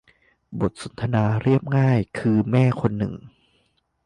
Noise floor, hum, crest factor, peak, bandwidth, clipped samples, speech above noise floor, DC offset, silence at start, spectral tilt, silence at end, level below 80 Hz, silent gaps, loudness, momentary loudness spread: -67 dBFS; none; 18 dB; -6 dBFS; 10 kHz; under 0.1%; 46 dB; under 0.1%; 0.5 s; -8.5 dB/octave; 0.75 s; -50 dBFS; none; -22 LUFS; 10 LU